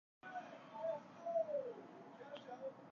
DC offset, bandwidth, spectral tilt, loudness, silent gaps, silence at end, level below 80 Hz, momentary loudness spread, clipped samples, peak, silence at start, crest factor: under 0.1%; 7 kHz; -3.5 dB/octave; -47 LUFS; none; 0 s; under -90 dBFS; 14 LU; under 0.1%; -30 dBFS; 0.25 s; 18 dB